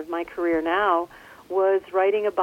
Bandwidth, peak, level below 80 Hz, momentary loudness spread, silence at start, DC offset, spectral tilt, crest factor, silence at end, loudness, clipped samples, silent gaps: 13.5 kHz; -8 dBFS; -60 dBFS; 8 LU; 0 s; under 0.1%; -5.5 dB/octave; 14 dB; 0 s; -23 LUFS; under 0.1%; none